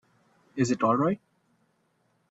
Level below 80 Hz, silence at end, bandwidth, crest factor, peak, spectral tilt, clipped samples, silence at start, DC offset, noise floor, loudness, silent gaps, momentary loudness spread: -66 dBFS; 1.15 s; 8 kHz; 18 dB; -12 dBFS; -6.5 dB/octave; under 0.1%; 0.55 s; under 0.1%; -71 dBFS; -27 LUFS; none; 12 LU